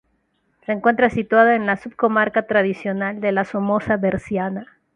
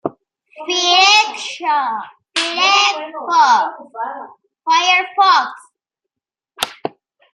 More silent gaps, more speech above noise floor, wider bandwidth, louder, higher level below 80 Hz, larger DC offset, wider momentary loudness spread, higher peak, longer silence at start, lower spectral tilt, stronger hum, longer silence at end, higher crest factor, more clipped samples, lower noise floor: neither; second, 48 dB vs 69 dB; second, 9.6 kHz vs 15.5 kHz; second, -19 LUFS vs -14 LUFS; first, -54 dBFS vs -76 dBFS; neither; second, 9 LU vs 17 LU; about the same, -2 dBFS vs 0 dBFS; first, 0.7 s vs 0.05 s; first, -7.5 dB/octave vs 0 dB/octave; neither; second, 0.3 s vs 0.45 s; about the same, 18 dB vs 16 dB; neither; second, -67 dBFS vs -85 dBFS